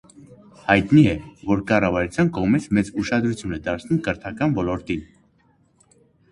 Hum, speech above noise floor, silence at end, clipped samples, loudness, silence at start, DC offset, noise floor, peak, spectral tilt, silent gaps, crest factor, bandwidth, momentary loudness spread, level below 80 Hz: none; 40 dB; 1.3 s; under 0.1%; -21 LUFS; 0.65 s; under 0.1%; -60 dBFS; 0 dBFS; -7 dB/octave; none; 22 dB; 11 kHz; 11 LU; -44 dBFS